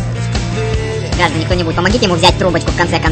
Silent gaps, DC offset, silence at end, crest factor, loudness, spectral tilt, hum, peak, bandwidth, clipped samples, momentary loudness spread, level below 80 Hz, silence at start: none; under 0.1%; 0 s; 14 dB; -14 LUFS; -5 dB/octave; none; 0 dBFS; 12 kHz; 0.2%; 8 LU; -24 dBFS; 0 s